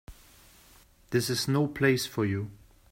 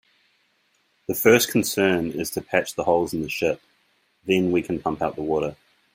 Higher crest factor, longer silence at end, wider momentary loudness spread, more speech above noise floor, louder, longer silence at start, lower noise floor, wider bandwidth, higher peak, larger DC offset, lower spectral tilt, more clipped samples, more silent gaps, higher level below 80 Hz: about the same, 20 dB vs 22 dB; about the same, 0.35 s vs 0.4 s; second, 8 LU vs 12 LU; second, 30 dB vs 44 dB; second, -28 LUFS vs -23 LUFS; second, 0.1 s vs 1.1 s; second, -58 dBFS vs -67 dBFS; about the same, 16 kHz vs 16 kHz; second, -10 dBFS vs -2 dBFS; neither; about the same, -5 dB/octave vs -4.5 dB/octave; neither; neither; about the same, -58 dBFS vs -56 dBFS